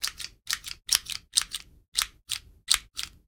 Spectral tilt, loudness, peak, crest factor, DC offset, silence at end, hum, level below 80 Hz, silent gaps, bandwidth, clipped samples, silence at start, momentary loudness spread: 2.5 dB/octave; -28 LUFS; 0 dBFS; 32 dB; under 0.1%; 0.2 s; none; -56 dBFS; 1.88-1.92 s; 19 kHz; under 0.1%; 0 s; 11 LU